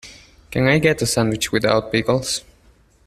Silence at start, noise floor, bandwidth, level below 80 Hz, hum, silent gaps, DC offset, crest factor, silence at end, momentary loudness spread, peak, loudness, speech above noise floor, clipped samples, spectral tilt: 0.05 s; -54 dBFS; 15 kHz; -46 dBFS; none; none; under 0.1%; 20 dB; 0.65 s; 9 LU; -2 dBFS; -19 LUFS; 35 dB; under 0.1%; -4.5 dB/octave